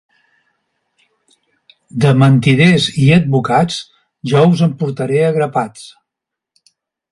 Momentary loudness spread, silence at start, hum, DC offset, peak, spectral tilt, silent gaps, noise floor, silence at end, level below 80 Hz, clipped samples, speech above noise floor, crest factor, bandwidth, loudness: 11 LU; 1.95 s; none; under 0.1%; 0 dBFS; -6.5 dB/octave; none; -82 dBFS; 1.25 s; -50 dBFS; under 0.1%; 70 dB; 14 dB; 11.5 kHz; -13 LUFS